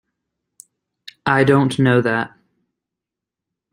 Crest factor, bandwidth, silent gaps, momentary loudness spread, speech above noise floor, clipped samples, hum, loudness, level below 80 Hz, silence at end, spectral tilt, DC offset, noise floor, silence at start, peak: 20 dB; 11.5 kHz; none; 11 LU; 70 dB; under 0.1%; none; -17 LUFS; -58 dBFS; 1.45 s; -7 dB/octave; under 0.1%; -85 dBFS; 1.25 s; -2 dBFS